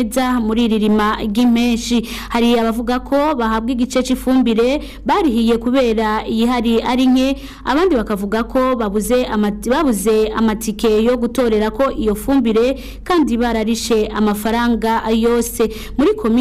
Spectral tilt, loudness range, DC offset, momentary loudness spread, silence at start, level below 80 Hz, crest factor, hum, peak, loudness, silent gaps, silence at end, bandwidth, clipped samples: -5 dB/octave; 1 LU; under 0.1%; 4 LU; 0 s; -34 dBFS; 6 dB; none; -8 dBFS; -16 LUFS; none; 0 s; 16 kHz; under 0.1%